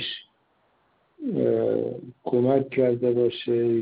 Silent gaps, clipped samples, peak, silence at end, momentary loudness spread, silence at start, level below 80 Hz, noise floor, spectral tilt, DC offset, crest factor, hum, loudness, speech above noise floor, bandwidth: none; under 0.1%; -8 dBFS; 0 s; 12 LU; 0 s; -66 dBFS; -67 dBFS; -6 dB/octave; under 0.1%; 16 dB; none; -24 LUFS; 44 dB; 5 kHz